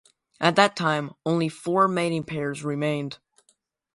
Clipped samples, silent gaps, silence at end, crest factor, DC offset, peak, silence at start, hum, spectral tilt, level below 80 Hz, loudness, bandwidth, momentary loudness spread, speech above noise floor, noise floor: under 0.1%; none; 0.8 s; 24 dB; under 0.1%; -2 dBFS; 0.4 s; none; -5.5 dB/octave; -68 dBFS; -24 LUFS; 11.5 kHz; 10 LU; 44 dB; -68 dBFS